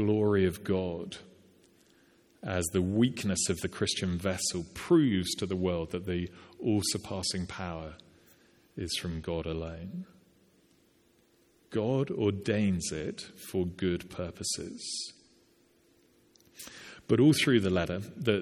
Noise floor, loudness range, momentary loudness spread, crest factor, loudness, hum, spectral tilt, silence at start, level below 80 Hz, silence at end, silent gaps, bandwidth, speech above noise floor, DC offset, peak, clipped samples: -66 dBFS; 9 LU; 17 LU; 22 dB; -31 LUFS; none; -5 dB/octave; 0 s; -56 dBFS; 0 s; none; 18 kHz; 36 dB; under 0.1%; -10 dBFS; under 0.1%